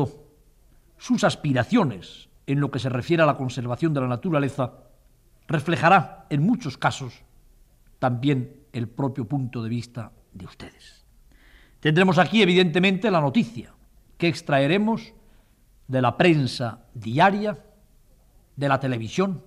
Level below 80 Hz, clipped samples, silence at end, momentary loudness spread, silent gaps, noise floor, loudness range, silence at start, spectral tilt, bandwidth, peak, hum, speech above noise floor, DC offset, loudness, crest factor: -56 dBFS; under 0.1%; 0.05 s; 19 LU; none; -57 dBFS; 7 LU; 0 s; -6.5 dB/octave; 12.5 kHz; -6 dBFS; none; 34 dB; under 0.1%; -23 LUFS; 18 dB